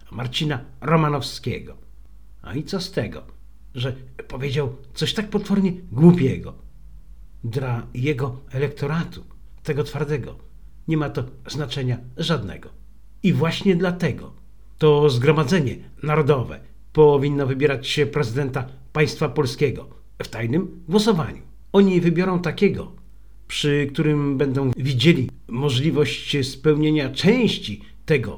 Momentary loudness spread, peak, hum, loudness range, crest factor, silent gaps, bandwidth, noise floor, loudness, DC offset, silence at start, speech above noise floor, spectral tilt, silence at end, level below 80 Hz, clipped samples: 15 LU; 0 dBFS; none; 7 LU; 20 dB; none; 18.5 kHz; -47 dBFS; -21 LUFS; 0.8%; 0.1 s; 26 dB; -6.5 dB/octave; 0 s; -46 dBFS; under 0.1%